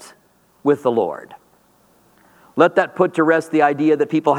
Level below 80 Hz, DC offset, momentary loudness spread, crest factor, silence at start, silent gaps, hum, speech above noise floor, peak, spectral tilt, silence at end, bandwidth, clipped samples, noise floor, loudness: -72 dBFS; under 0.1%; 9 LU; 18 dB; 0 s; none; none; 40 dB; 0 dBFS; -6.5 dB/octave; 0 s; 12 kHz; under 0.1%; -57 dBFS; -17 LUFS